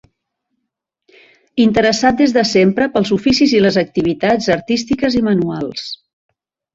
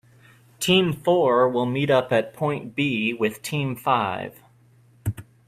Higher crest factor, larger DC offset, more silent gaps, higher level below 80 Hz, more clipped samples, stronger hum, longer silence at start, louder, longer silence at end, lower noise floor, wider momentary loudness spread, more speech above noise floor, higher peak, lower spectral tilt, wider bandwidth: about the same, 14 dB vs 18 dB; neither; neither; first, -46 dBFS vs -56 dBFS; neither; neither; first, 1.55 s vs 0.6 s; first, -14 LUFS vs -23 LUFS; first, 0.8 s vs 0.25 s; first, -76 dBFS vs -56 dBFS; about the same, 11 LU vs 13 LU; first, 62 dB vs 34 dB; first, 0 dBFS vs -6 dBFS; about the same, -5 dB/octave vs -5.5 dB/octave; second, 7.8 kHz vs 15.5 kHz